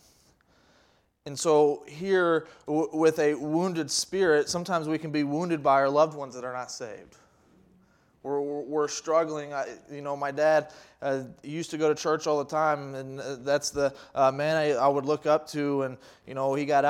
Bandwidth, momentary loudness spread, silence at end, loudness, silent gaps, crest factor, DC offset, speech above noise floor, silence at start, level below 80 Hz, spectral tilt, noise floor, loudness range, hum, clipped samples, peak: 15.5 kHz; 13 LU; 0 s; -27 LUFS; none; 18 dB; under 0.1%; 38 dB; 1.25 s; -68 dBFS; -4.5 dB/octave; -65 dBFS; 6 LU; none; under 0.1%; -10 dBFS